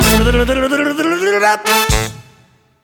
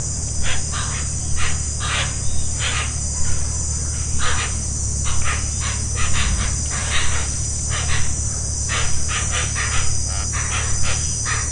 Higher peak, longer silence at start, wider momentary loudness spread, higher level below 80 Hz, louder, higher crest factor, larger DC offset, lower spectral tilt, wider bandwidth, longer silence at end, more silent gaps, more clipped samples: first, 0 dBFS vs -4 dBFS; about the same, 0 s vs 0 s; about the same, 4 LU vs 2 LU; about the same, -24 dBFS vs -26 dBFS; first, -13 LUFS vs -21 LUFS; about the same, 14 dB vs 14 dB; second, under 0.1% vs 0.8%; first, -4 dB/octave vs -2 dB/octave; first, 19.5 kHz vs 11 kHz; first, 0.65 s vs 0 s; neither; neither